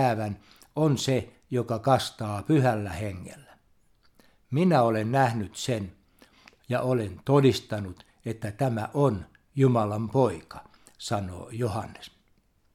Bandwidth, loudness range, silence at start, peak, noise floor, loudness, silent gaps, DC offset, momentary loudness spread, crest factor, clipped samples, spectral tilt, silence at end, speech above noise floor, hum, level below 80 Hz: 15 kHz; 3 LU; 0 s; -8 dBFS; -66 dBFS; -27 LUFS; none; under 0.1%; 17 LU; 20 dB; under 0.1%; -6.5 dB/octave; 0.65 s; 40 dB; none; -58 dBFS